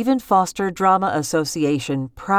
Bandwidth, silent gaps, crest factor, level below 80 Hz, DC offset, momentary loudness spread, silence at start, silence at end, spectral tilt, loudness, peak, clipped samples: 19 kHz; none; 14 dB; -52 dBFS; under 0.1%; 6 LU; 0 s; 0 s; -5 dB/octave; -20 LUFS; -4 dBFS; under 0.1%